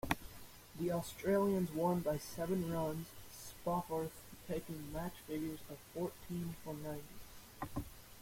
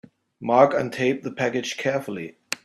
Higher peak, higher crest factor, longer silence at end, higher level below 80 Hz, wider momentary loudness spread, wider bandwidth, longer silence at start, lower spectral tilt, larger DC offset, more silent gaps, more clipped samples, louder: second, -16 dBFS vs -2 dBFS; about the same, 26 dB vs 22 dB; about the same, 0 s vs 0.1 s; first, -60 dBFS vs -66 dBFS; about the same, 16 LU vs 16 LU; first, 16.5 kHz vs 14.5 kHz; second, 0.05 s vs 0.4 s; about the same, -6 dB/octave vs -5 dB/octave; neither; neither; neither; second, -41 LUFS vs -23 LUFS